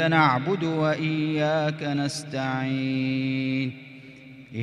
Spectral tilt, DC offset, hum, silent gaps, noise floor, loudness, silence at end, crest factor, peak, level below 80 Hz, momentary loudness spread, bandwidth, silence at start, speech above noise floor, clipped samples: -6 dB/octave; under 0.1%; none; none; -45 dBFS; -25 LUFS; 0 s; 18 dB; -6 dBFS; -66 dBFS; 20 LU; 12 kHz; 0 s; 21 dB; under 0.1%